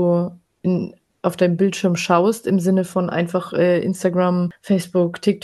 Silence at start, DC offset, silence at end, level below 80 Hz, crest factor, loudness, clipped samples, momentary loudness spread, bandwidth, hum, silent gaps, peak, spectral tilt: 0 s; under 0.1%; 0.05 s; -62 dBFS; 16 dB; -19 LUFS; under 0.1%; 7 LU; 12.5 kHz; none; none; -2 dBFS; -6.5 dB/octave